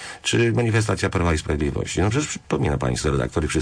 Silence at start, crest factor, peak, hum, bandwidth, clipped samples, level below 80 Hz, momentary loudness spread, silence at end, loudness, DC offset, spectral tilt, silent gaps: 0 s; 12 dB; -10 dBFS; none; 10.5 kHz; under 0.1%; -34 dBFS; 5 LU; 0 s; -22 LUFS; under 0.1%; -5 dB/octave; none